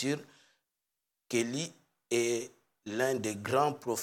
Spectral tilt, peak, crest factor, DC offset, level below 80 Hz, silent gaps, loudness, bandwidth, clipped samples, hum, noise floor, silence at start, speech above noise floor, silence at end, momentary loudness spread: -4 dB/octave; -16 dBFS; 20 dB; under 0.1%; -82 dBFS; none; -33 LUFS; 18 kHz; under 0.1%; none; -87 dBFS; 0 s; 55 dB; 0 s; 11 LU